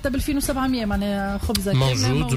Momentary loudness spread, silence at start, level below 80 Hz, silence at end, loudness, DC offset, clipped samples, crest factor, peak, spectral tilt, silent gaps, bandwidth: 4 LU; 0 s; -32 dBFS; 0 s; -22 LUFS; under 0.1%; under 0.1%; 12 dB; -10 dBFS; -5 dB/octave; none; 16 kHz